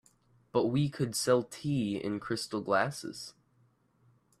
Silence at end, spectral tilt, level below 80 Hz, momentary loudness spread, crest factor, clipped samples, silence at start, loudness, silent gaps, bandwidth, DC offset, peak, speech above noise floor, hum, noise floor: 1.1 s; -5 dB/octave; -66 dBFS; 12 LU; 20 dB; under 0.1%; 0.55 s; -32 LUFS; none; 14.5 kHz; under 0.1%; -14 dBFS; 38 dB; none; -69 dBFS